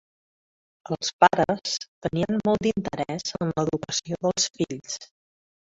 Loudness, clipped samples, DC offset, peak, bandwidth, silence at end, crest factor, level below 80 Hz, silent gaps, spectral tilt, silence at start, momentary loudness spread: -25 LUFS; under 0.1%; under 0.1%; -2 dBFS; 8 kHz; 0.75 s; 24 dB; -58 dBFS; 1.13-1.19 s, 1.88-2.01 s; -4 dB/octave; 0.9 s; 10 LU